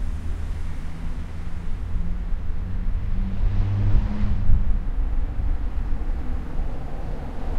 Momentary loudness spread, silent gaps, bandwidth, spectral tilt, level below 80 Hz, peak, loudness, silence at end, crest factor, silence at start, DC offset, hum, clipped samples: 10 LU; none; 4.3 kHz; -8.5 dB/octave; -24 dBFS; -4 dBFS; -29 LUFS; 0 s; 16 dB; 0 s; under 0.1%; none; under 0.1%